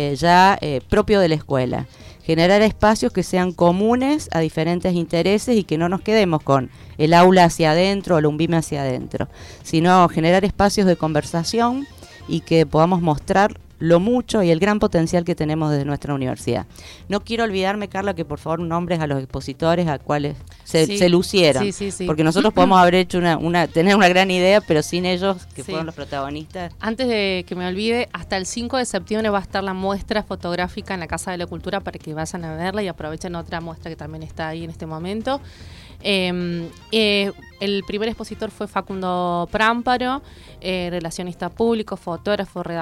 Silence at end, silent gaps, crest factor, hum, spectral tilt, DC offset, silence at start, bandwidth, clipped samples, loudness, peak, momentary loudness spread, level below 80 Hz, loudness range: 0 s; none; 16 dB; none; -5.5 dB/octave; under 0.1%; 0 s; 15 kHz; under 0.1%; -19 LUFS; -4 dBFS; 14 LU; -42 dBFS; 9 LU